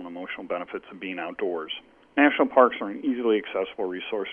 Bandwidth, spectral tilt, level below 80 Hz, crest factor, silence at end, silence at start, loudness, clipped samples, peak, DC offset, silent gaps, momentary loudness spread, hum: 3.6 kHz; -7 dB/octave; -68 dBFS; 22 dB; 0 s; 0 s; -26 LUFS; under 0.1%; -4 dBFS; under 0.1%; none; 16 LU; none